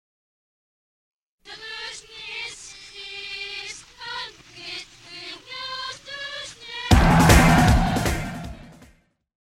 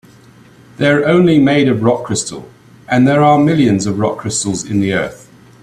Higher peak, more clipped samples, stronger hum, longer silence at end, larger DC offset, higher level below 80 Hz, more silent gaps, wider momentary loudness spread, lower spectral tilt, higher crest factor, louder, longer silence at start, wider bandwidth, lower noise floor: about the same, 0 dBFS vs 0 dBFS; neither; neither; first, 0.9 s vs 0.45 s; neither; first, -30 dBFS vs -50 dBFS; neither; first, 23 LU vs 9 LU; about the same, -5 dB/octave vs -5.5 dB/octave; first, 24 dB vs 14 dB; second, -22 LUFS vs -13 LUFS; first, 1.45 s vs 0.8 s; first, 16 kHz vs 13 kHz; first, -58 dBFS vs -43 dBFS